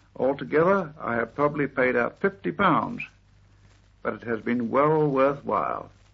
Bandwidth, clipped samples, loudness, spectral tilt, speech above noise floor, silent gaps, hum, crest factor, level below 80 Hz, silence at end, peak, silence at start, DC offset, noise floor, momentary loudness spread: 6.4 kHz; under 0.1%; -25 LUFS; -8.5 dB/octave; 32 dB; none; none; 18 dB; -58 dBFS; 0.25 s; -8 dBFS; 0.2 s; under 0.1%; -56 dBFS; 11 LU